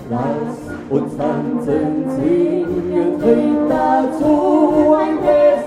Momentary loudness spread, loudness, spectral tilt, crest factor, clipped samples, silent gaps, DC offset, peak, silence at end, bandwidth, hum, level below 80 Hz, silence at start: 8 LU; -16 LUFS; -8 dB/octave; 14 dB; under 0.1%; none; under 0.1%; -2 dBFS; 0 s; 10.5 kHz; none; -46 dBFS; 0 s